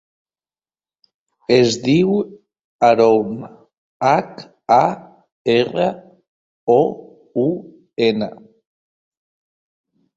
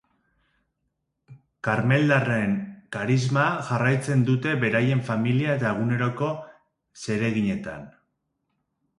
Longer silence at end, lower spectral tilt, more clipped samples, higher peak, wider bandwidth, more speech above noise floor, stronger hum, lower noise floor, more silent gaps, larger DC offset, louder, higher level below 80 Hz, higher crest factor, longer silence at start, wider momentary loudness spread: first, 1.85 s vs 1.1 s; about the same, -6 dB/octave vs -7 dB/octave; neither; first, 0 dBFS vs -6 dBFS; second, 7.8 kHz vs 11.5 kHz; first, over 74 dB vs 54 dB; neither; first, under -90 dBFS vs -78 dBFS; first, 2.64-2.79 s, 3.78-4.00 s, 5.32-5.45 s, 6.28-6.67 s vs none; neither; first, -17 LUFS vs -24 LUFS; about the same, -60 dBFS vs -60 dBFS; about the same, 18 dB vs 20 dB; first, 1.5 s vs 1.3 s; first, 19 LU vs 11 LU